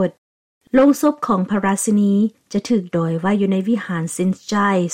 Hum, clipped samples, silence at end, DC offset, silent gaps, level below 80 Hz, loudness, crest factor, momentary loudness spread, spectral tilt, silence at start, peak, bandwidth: none; under 0.1%; 0 s; under 0.1%; 0.18-0.61 s; -56 dBFS; -18 LUFS; 14 dB; 7 LU; -6 dB/octave; 0 s; -4 dBFS; 16.5 kHz